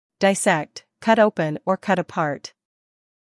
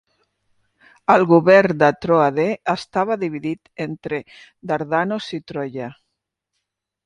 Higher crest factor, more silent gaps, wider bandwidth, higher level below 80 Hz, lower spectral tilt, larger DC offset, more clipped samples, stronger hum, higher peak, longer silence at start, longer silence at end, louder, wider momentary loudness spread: about the same, 18 dB vs 20 dB; neither; first, 12 kHz vs 10.5 kHz; second, -70 dBFS vs -60 dBFS; second, -4.5 dB/octave vs -7 dB/octave; neither; neither; neither; second, -4 dBFS vs 0 dBFS; second, 0.2 s vs 1.1 s; second, 0.9 s vs 1.15 s; about the same, -21 LUFS vs -19 LUFS; about the same, 14 LU vs 16 LU